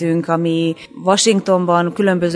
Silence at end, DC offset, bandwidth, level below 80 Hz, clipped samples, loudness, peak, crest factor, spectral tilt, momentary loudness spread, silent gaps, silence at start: 0 s; under 0.1%; 11 kHz; -60 dBFS; under 0.1%; -16 LUFS; 0 dBFS; 14 dB; -5 dB/octave; 6 LU; none; 0 s